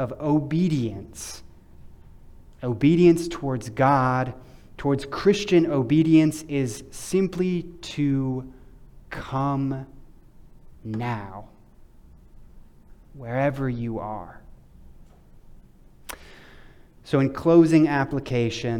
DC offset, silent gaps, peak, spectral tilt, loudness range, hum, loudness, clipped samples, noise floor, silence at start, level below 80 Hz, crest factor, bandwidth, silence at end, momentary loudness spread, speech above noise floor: under 0.1%; none; -6 dBFS; -7 dB/octave; 13 LU; none; -23 LUFS; under 0.1%; -50 dBFS; 0 s; -48 dBFS; 20 dB; 14.5 kHz; 0 s; 21 LU; 27 dB